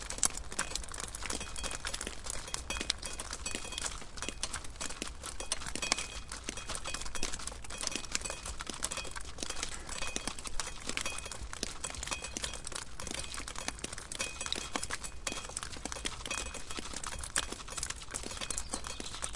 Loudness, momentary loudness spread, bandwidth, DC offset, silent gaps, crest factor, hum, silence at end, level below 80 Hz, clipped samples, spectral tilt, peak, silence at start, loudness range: -38 LUFS; 6 LU; 11.5 kHz; under 0.1%; none; 32 dB; none; 0 s; -48 dBFS; under 0.1%; -1 dB/octave; -6 dBFS; 0 s; 1 LU